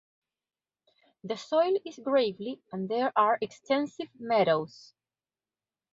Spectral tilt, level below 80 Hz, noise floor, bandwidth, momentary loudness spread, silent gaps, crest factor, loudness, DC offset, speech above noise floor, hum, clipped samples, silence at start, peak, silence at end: -5.5 dB/octave; -76 dBFS; under -90 dBFS; 7.8 kHz; 13 LU; none; 20 dB; -29 LUFS; under 0.1%; over 62 dB; none; under 0.1%; 1.25 s; -10 dBFS; 1.25 s